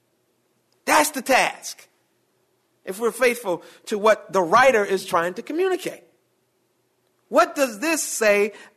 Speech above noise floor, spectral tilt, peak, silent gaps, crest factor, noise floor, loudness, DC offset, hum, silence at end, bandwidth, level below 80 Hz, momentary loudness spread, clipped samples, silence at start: 47 dB; -2.5 dB/octave; -6 dBFS; none; 18 dB; -68 dBFS; -21 LUFS; under 0.1%; none; 0.15 s; 14 kHz; -66 dBFS; 14 LU; under 0.1%; 0.85 s